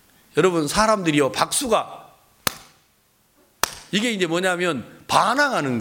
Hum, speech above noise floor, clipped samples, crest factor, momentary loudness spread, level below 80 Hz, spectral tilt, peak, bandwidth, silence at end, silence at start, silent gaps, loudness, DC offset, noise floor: none; 41 dB; under 0.1%; 22 dB; 8 LU; -50 dBFS; -3.5 dB/octave; 0 dBFS; 17 kHz; 0 s; 0.35 s; none; -21 LUFS; under 0.1%; -62 dBFS